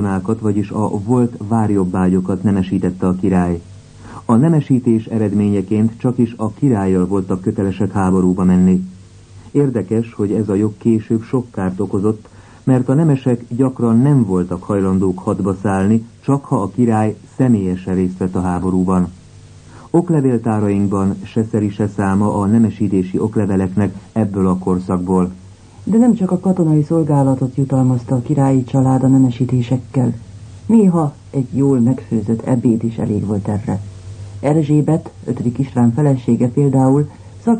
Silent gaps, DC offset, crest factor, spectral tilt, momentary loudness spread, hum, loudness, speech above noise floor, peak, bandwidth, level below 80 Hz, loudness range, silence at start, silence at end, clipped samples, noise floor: none; under 0.1%; 14 dB; -9 dB/octave; 7 LU; none; -16 LUFS; 25 dB; -2 dBFS; 9.6 kHz; -46 dBFS; 3 LU; 0 s; 0 s; under 0.1%; -40 dBFS